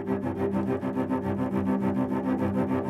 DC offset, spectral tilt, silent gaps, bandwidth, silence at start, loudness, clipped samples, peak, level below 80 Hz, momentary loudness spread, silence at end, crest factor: under 0.1%; -9.5 dB/octave; none; 12.5 kHz; 0 s; -28 LUFS; under 0.1%; -16 dBFS; -58 dBFS; 2 LU; 0 s; 12 dB